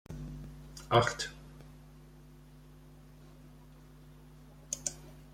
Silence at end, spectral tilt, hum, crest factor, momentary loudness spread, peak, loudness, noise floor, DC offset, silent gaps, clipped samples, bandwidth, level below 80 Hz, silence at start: 0 s; -4 dB/octave; none; 28 dB; 27 LU; -12 dBFS; -34 LUFS; -55 dBFS; under 0.1%; none; under 0.1%; 16.5 kHz; -56 dBFS; 0.1 s